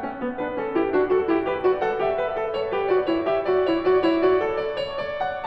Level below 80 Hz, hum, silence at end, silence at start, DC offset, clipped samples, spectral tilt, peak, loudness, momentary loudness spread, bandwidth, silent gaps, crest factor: -52 dBFS; none; 0 s; 0 s; under 0.1%; under 0.1%; -7.5 dB/octave; -8 dBFS; -23 LUFS; 8 LU; 5.8 kHz; none; 14 dB